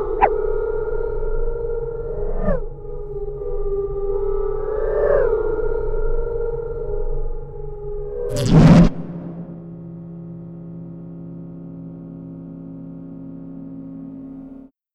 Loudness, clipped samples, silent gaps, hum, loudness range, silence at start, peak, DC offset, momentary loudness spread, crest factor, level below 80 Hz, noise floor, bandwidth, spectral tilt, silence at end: -21 LUFS; under 0.1%; none; none; 17 LU; 0 s; -2 dBFS; under 0.1%; 17 LU; 18 dB; -26 dBFS; -41 dBFS; 11.5 kHz; -8 dB/octave; 0.3 s